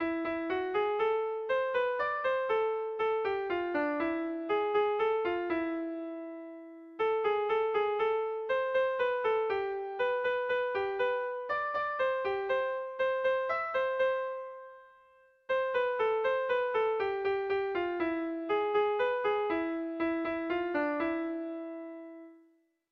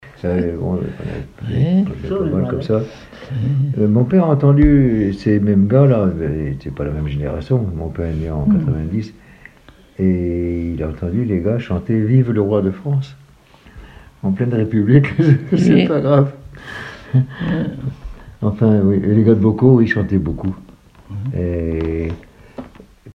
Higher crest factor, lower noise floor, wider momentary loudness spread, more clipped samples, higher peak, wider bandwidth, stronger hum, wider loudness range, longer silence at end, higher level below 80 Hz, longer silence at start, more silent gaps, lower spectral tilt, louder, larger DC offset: about the same, 12 dB vs 16 dB; first, -68 dBFS vs -46 dBFS; second, 9 LU vs 16 LU; neither; second, -18 dBFS vs 0 dBFS; about the same, 6 kHz vs 6.2 kHz; neither; second, 2 LU vs 6 LU; first, 0.55 s vs 0.05 s; second, -68 dBFS vs -34 dBFS; about the same, 0 s vs 0.05 s; neither; second, -6 dB/octave vs -9.5 dB/octave; second, -32 LUFS vs -17 LUFS; neither